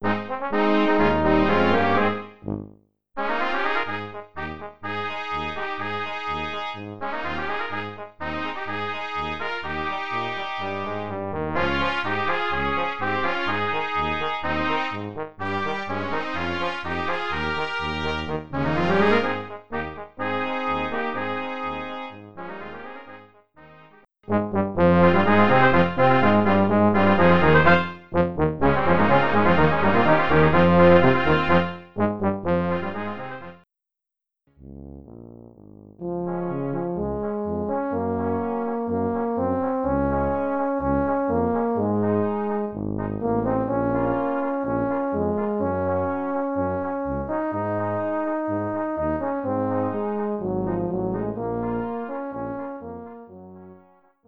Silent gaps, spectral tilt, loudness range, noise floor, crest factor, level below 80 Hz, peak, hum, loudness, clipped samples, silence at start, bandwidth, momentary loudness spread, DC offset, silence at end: none; -8 dB/octave; 11 LU; -87 dBFS; 20 dB; -44 dBFS; -2 dBFS; none; -23 LUFS; under 0.1%; 0 s; 7.4 kHz; 14 LU; 0.8%; 0 s